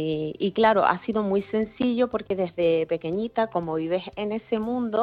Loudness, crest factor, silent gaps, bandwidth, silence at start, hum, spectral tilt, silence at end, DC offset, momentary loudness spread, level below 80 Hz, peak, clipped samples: -25 LUFS; 20 dB; none; 5 kHz; 0 s; none; -9 dB/octave; 0 s; under 0.1%; 7 LU; -58 dBFS; -4 dBFS; under 0.1%